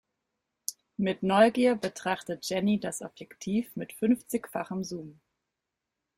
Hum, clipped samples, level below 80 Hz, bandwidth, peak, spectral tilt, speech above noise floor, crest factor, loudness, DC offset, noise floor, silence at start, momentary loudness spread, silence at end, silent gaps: none; under 0.1%; -68 dBFS; 16.5 kHz; -8 dBFS; -5 dB/octave; 58 dB; 22 dB; -29 LUFS; under 0.1%; -86 dBFS; 0.7 s; 16 LU; 1.05 s; none